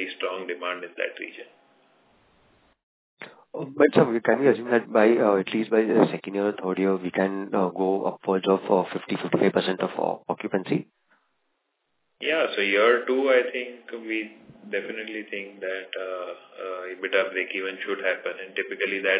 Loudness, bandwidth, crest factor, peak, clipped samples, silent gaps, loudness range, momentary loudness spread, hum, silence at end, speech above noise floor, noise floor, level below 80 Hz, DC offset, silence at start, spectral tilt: -25 LUFS; 4 kHz; 22 dB; -4 dBFS; under 0.1%; 2.83-3.17 s; 10 LU; 15 LU; none; 0 s; 50 dB; -75 dBFS; -76 dBFS; under 0.1%; 0 s; -9.5 dB/octave